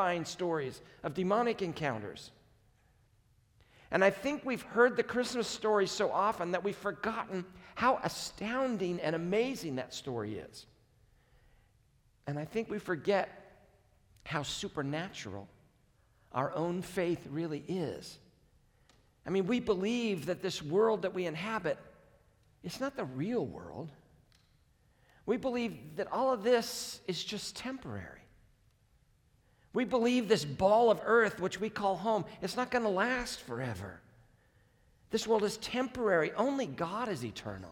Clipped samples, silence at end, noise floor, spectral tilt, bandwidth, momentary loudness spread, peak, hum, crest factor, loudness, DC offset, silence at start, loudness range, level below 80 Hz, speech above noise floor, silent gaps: under 0.1%; 0 s; -68 dBFS; -5 dB/octave; 18.5 kHz; 14 LU; -14 dBFS; none; 22 dB; -33 LUFS; under 0.1%; 0 s; 8 LU; -66 dBFS; 35 dB; none